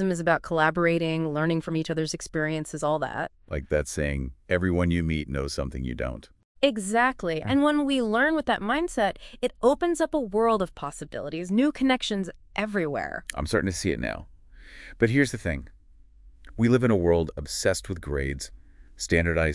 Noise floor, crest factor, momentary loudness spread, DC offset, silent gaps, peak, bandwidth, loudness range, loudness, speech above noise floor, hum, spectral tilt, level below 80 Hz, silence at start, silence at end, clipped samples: -53 dBFS; 20 dB; 11 LU; under 0.1%; 6.45-6.55 s; -6 dBFS; 12 kHz; 4 LU; -26 LUFS; 27 dB; none; -5.5 dB/octave; -44 dBFS; 0 s; 0 s; under 0.1%